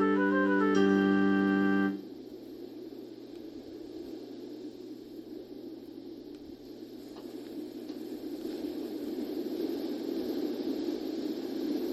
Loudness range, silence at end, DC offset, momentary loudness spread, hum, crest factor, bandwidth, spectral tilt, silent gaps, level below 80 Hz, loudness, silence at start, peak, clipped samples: 15 LU; 0 s; under 0.1%; 19 LU; none; 18 dB; 13.5 kHz; -7 dB/octave; none; -72 dBFS; -31 LUFS; 0 s; -14 dBFS; under 0.1%